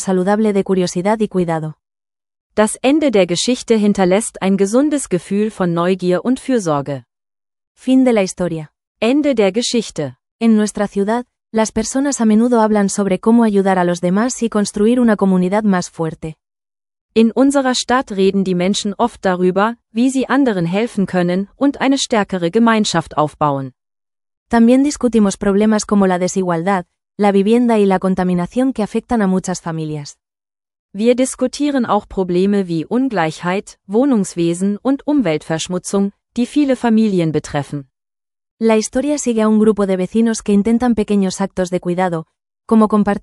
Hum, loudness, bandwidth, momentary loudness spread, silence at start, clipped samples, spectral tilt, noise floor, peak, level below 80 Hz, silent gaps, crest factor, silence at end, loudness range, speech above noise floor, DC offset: none; -16 LUFS; 12 kHz; 8 LU; 0 s; under 0.1%; -5.5 dB/octave; under -90 dBFS; 0 dBFS; -48 dBFS; 2.41-2.50 s, 7.67-7.75 s, 8.87-8.95 s, 10.31-10.39 s, 17.01-17.09 s, 24.37-24.46 s, 30.79-30.89 s, 38.51-38.57 s; 14 dB; 0.05 s; 3 LU; over 75 dB; under 0.1%